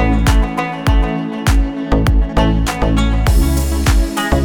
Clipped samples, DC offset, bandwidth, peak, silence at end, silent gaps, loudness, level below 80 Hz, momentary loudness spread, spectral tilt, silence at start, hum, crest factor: under 0.1%; under 0.1%; 19 kHz; -2 dBFS; 0 s; none; -16 LUFS; -16 dBFS; 3 LU; -6 dB/octave; 0 s; none; 12 dB